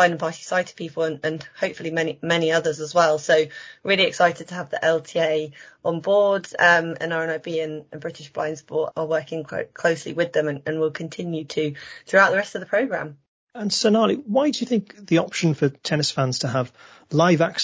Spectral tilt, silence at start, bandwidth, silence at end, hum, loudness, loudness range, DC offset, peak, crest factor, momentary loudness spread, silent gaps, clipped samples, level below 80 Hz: -4.5 dB/octave; 0 s; 8 kHz; 0 s; none; -22 LUFS; 5 LU; under 0.1%; -2 dBFS; 20 dB; 12 LU; 13.28-13.47 s; under 0.1%; -66 dBFS